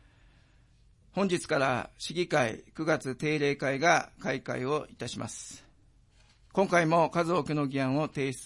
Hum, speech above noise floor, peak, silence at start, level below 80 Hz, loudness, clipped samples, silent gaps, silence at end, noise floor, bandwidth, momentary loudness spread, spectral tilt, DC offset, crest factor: none; 32 dB; -10 dBFS; 1.15 s; -62 dBFS; -29 LUFS; under 0.1%; none; 0 s; -61 dBFS; 11.5 kHz; 12 LU; -5 dB/octave; under 0.1%; 20 dB